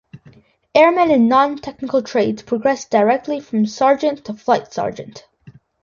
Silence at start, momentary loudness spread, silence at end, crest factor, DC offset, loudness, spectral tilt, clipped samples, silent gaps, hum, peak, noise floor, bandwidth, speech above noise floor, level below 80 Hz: 0.15 s; 12 LU; 0.35 s; 18 dB; under 0.1%; -17 LUFS; -5.5 dB/octave; under 0.1%; none; none; 0 dBFS; -49 dBFS; 7.4 kHz; 32 dB; -58 dBFS